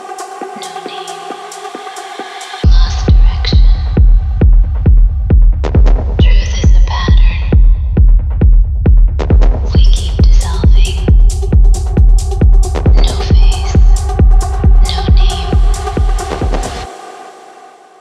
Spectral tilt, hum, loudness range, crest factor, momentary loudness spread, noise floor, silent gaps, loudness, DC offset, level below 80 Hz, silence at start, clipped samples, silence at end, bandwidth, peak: -6 dB/octave; none; 3 LU; 8 dB; 13 LU; -37 dBFS; none; -12 LUFS; under 0.1%; -8 dBFS; 0 s; under 0.1%; 0.7 s; 10 kHz; 0 dBFS